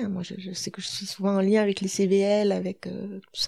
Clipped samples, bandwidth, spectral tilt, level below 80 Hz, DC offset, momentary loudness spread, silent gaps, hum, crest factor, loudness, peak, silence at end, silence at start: under 0.1%; 14 kHz; -5 dB/octave; -70 dBFS; under 0.1%; 13 LU; none; none; 14 dB; -26 LUFS; -12 dBFS; 0 s; 0 s